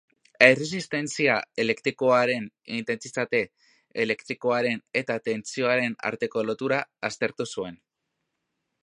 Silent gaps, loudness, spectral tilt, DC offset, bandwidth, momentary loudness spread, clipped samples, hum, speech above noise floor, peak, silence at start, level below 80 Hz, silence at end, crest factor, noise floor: none; -25 LUFS; -4 dB/octave; under 0.1%; 11 kHz; 12 LU; under 0.1%; none; 55 dB; 0 dBFS; 0.4 s; -72 dBFS; 1.1 s; 26 dB; -81 dBFS